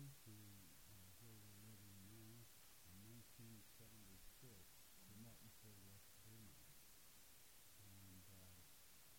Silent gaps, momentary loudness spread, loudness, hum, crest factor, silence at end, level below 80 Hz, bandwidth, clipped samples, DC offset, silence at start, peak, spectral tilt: none; 3 LU; -64 LUFS; none; 16 dB; 0 s; -78 dBFS; 16.5 kHz; under 0.1%; under 0.1%; 0 s; -50 dBFS; -3.5 dB/octave